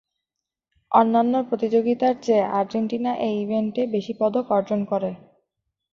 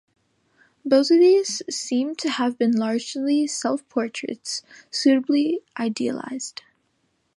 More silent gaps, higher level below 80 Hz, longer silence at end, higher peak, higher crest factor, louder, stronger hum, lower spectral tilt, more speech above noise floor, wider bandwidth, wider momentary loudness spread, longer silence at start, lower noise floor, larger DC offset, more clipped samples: neither; first, -66 dBFS vs -78 dBFS; about the same, 0.75 s vs 0.85 s; about the same, -4 dBFS vs -6 dBFS; about the same, 20 dB vs 16 dB; about the same, -22 LUFS vs -22 LUFS; neither; first, -7.5 dB/octave vs -3.5 dB/octave; first, 64 dB vs 48 dB; second, 7.2 kHz vs 11.5 kHz; second, 6 LU vs 14 LU; about the same, 0.9 s vs 0.85 s; first, -86 dBFS vs -70 dBFS; neither; neither